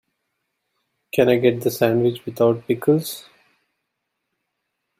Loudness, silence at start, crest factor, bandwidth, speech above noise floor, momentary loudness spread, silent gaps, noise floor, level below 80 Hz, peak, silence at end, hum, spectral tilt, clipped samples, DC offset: -19 LUFS; 1.15 s; 20 dB; 16 kHz; 59 dB; 8 LU; none; -78 dBFS; -62 dBFS; -2 dBFS; 1.8 s; none; -6 dB/octave; under 0.1%; under 0.1%